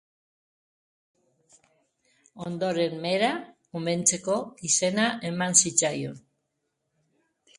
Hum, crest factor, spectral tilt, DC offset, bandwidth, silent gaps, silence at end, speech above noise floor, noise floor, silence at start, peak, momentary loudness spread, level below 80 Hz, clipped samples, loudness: none; 24 dB; -2.5 dB/octave; under 0.1%; 11.5 kHz; none; 1.4 s; 53 dB; -79 dBFS; 2.35 s; -4 dBFS; 16 LU; -70 dBFS; under 0.1%; -25 LUFS